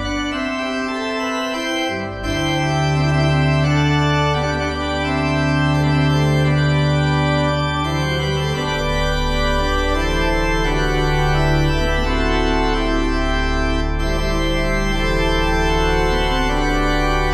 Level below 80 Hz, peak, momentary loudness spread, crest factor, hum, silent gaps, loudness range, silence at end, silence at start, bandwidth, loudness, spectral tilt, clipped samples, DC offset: -24 dBFS; -4 dBFS; 5 LU; 12 dB; none; none; 2 LU; 0 s; 0 s; 13.5 kHz; -18 LUFS; -5.5 dB/octave; under 0.1%; under 0.1%